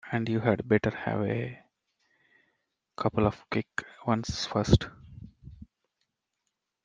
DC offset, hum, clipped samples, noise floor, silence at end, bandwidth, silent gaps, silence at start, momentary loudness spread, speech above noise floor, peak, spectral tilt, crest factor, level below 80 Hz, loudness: under 0.1%; none; under 0.1%; -83 dBFS; 1.2 s; 9.4 kHz; none; 0.05 s; 22 LU; 55 dB; -6 dBFS; -6.5 dB/octave; 24 dB; -48 dBFS; -29 LUFS